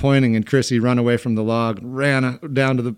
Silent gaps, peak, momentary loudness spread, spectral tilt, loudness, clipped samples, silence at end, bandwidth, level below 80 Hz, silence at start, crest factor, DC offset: none; -4 dBFS; 5 LU; -6.5 dB/octave; -19 LUFS; under 0.1%; 0 s; 12.5 kHz; -52 dBFS; 0 s; 14 dB; under 0.1%